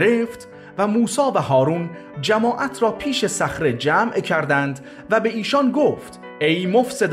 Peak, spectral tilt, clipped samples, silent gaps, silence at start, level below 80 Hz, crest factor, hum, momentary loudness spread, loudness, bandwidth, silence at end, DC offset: -4 dBFS; -5 dB/octave; under 0.1%; none; 0 s; -54 dBFS; 14 dB; none; 9 LU; -20 LUFS; 15 kHz; 0 s; under 0.1%